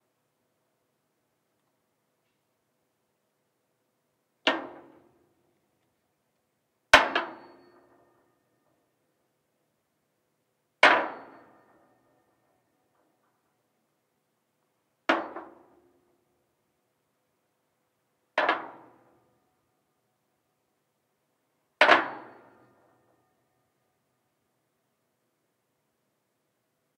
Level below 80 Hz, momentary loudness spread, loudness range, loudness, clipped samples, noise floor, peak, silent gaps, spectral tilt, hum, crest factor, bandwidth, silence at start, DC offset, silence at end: -66 dBFS; 25 LU; 9 LU; -24 LUFS; under 0.1%; -77 dBFS; 0 dBFS; none; -1.5 dB/octave; none; 34 dB; 15.5 kHz; 4.45 s; under 0.1%; 4.75 s